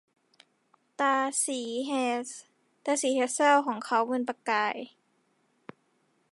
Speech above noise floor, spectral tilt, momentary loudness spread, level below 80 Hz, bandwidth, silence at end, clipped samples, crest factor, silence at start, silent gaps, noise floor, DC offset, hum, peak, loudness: 43 dB; -1.5 dB/octave; 15 LU; -86 dBFS; 11.5 kHz; 1.45 s; under 0.1%; 20 dB; 1 s; none; -71 dBFS; under 0.1%; none; -10 dBFS; -28 LUFS